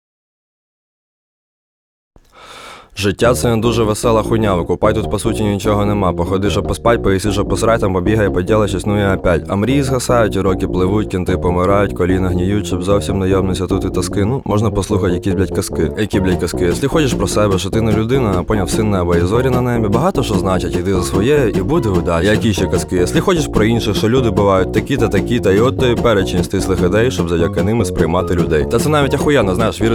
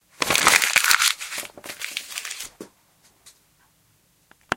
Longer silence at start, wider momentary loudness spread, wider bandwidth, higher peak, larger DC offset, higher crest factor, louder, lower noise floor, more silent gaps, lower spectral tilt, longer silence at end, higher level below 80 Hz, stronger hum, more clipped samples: first, 2.4 s vs 0.2 s; second, 4 LU vs 18 LU; about the same, 17.5 kHz vs 17 kHz; about the same, 0 dBFS vs 0 dBFS; neither; second, 14 dB vs 26 dB; first, -15 LUFS vs -19 LUFS; second, -38 dBFS vs -62 dBFS; neither; first, -6 dB/octave vs 0.5 dB/octave; about the same, 0 s vs 0 s; first, -28 dBFS vs -60 dBFS; neither; neither